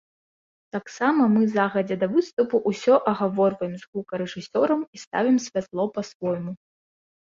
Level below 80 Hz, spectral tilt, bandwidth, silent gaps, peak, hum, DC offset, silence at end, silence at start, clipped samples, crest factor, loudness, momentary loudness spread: -68 dBFS; -6.5 dB/octave; 7.6 kHz; 2.33-2.37 s, 3.87-3.93 s, 4.87-4.93 s, 5.07-5.11 s, 6.15-6.20 s; -6 dBFS; none; under 0.1%; 0.65 s; 0.75 s; under 0.1%; 18 dB; -24 LUFS; 12 LU